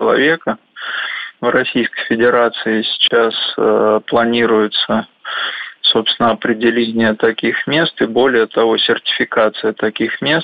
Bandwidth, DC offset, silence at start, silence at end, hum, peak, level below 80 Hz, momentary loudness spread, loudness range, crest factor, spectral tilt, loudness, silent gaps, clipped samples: 5 kHz; under 0.1%; 0 s; 0 s; none; -2 dBFS; -56 dBFS; 8 LU; 1 LU; 12 dB; -7 dB/octave; -15 LUFS; none; under 0.1%